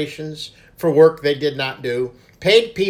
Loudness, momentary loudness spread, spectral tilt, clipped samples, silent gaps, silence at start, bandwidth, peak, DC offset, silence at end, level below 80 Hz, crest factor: -18 LUFS; 16 LU; -5 dB/octave; under 0.1%; none; 0 s; 15.5 kHz; 0 dBFS; under 0.1%; 0 s; -54 dBFS; 18 dB